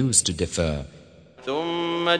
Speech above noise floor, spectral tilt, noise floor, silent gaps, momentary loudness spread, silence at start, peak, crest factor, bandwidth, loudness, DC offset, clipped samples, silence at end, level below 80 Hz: 24 dB; -3 dB/octave; -48 dBFS; none; 15 LU; 0 s; -4 dBFS; 20 dB; 10 kHz; -24 LUFS; under 0.1%; under 0.1%; 0 s; -42 dBFS